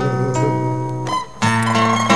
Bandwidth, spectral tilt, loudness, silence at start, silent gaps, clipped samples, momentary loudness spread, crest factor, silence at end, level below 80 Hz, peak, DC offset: 11 kHz; -5.5 dB/octave; -18 LUFS; 0 s; none; under 0.1%; 7 LU; 16 dB; 0 s; -50 dBFS; -2 dBFS; 1%